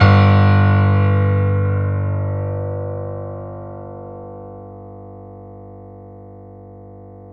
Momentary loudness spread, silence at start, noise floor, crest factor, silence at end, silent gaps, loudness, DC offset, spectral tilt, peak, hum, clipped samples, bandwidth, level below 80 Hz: 26 LU; 0 s; -38 dBFS; 18 dB; 0 s; none; -16 LUFS; under 0.1%; -9.5 dB/octave; 0 dBFS; 50 Hz at -65 dBFS; under 0.1%; 5.4 kHz; -46 dBFS